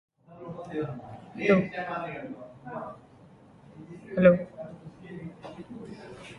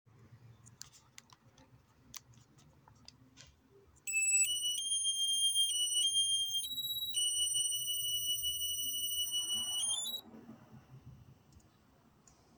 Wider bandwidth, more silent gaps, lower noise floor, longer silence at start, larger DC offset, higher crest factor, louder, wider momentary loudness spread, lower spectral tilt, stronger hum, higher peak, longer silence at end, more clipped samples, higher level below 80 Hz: second, 9.6 kHz vs over 20 kHz; neither; second, -54 dBFS vs -67 dBFS; about the same, 0.3 s vs 0.2 s; neither; first, 24 dB vs 16 dB; first, -27 LUFS vs -32 LUFS; about the same, 24 LU vs 22 LU; first, -8.5 dB/octave vs 2 dB/octave; neither; first, -6 dBFS vs -22 dBFS; second, 0 s vs 1.25 s; neither; first, -62 dBFS vs -70 dBFS